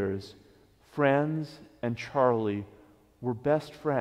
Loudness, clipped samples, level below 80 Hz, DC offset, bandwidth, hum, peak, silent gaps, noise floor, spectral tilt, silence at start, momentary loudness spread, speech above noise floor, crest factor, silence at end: -29 LUFS; under 0.1%; -64 dBFS; under 0.1%; 13.5 kHz; none; -10 dBFS; none; -60 dBFS; -8 dB/octave; 0 s; 16 LU; 31 dB; 20 dB; 0 s